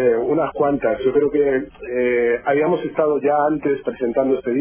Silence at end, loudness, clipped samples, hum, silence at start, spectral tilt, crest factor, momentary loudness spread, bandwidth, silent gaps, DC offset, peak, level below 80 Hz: 0 s; -19 LUFS; under 0.1%; none; 0 s; -10.5 dB/octave; 14 dB; 4 LU; 3.5 kHz; none; under 0.1%; -4 dBFS; -50 dBFS